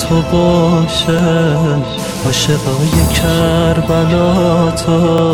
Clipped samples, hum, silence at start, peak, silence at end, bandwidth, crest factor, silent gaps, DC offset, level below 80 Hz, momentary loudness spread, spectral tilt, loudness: under 0.1%; none; 0 s; 0 dBFS; 0 s; 17 kHz; 12 dB; none; under 0.1%; -26 dBFS; 3 LU; -5.5 dB/octave; -12 LUFS